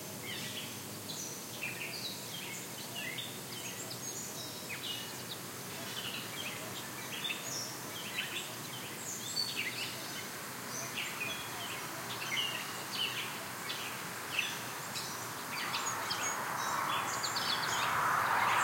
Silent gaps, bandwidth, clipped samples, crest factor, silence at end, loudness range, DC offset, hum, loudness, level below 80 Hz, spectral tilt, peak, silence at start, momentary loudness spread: none; 16.5 kHz; under 0.1%; 20 dB; 0 s; 5 LU; under 0.1%; none; -37 LUFS; -76 dBFS; -1.5 dB/octave; -18 dBFS; 0 s; 8 LU